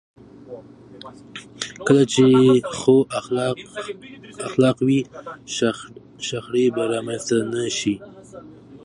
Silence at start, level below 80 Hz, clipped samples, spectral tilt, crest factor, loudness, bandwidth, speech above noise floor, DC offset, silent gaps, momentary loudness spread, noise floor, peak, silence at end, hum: 0.45 s; -60 dBFS; under 0.1%; -5.5 dB/octave; 18 dB; -20 LUFS; 11 kHz; 21 dB; under 0.1%; none; 25 LU; -42 dBFS; -2 dBFS; 0.05 s; none